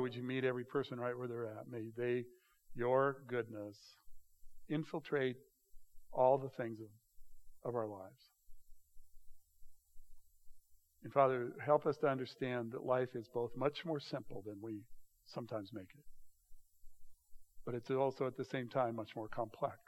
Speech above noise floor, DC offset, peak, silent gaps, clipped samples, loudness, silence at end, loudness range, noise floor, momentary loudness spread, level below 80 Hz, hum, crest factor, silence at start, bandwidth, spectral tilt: 21 dB; under 0.1%; -18 dBFS; none; under 0.1%; -40 LUFS; 0.1 s; 13 LU; -60 dBFS; 16 LU; -66 dBFS; none; 24 dB; 0 s; 16.5 kHz; -7.5 dB/octave